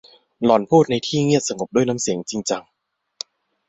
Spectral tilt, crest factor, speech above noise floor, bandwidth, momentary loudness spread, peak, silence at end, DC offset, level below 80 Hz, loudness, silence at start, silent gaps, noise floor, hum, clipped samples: -5 dB/octave; 18 dB; 20 dB; 8.4 kHz; 19 LU; -2 dBFS; 1.1 s; under 0.1%; -60 dBFS; -20 LUFS; 0.4 s; none; -39 dBFS; none; under 0.1%